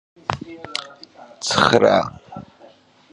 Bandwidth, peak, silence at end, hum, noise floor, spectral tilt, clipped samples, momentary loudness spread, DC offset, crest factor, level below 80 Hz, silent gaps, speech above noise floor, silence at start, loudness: 11 kHz; 0 dBFS; 0.7 s; none; -49 dBFS; -4 dB/octave; under 0.1%; 25 LU; under 0.1%; 22 dB; -52 dBFS; none; 32 dB; 0.3 s; -19 LUFS